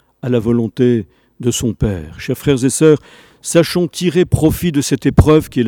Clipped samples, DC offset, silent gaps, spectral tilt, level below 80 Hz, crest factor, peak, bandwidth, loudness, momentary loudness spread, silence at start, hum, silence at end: under 0.1%; under 0.1%; none; -6 dB/octave; -30 dBFS; 14 dB; 0 dBFS; 19.5 kHz; -15 LUFS; 8 LU; 0.25 s; none; 0 s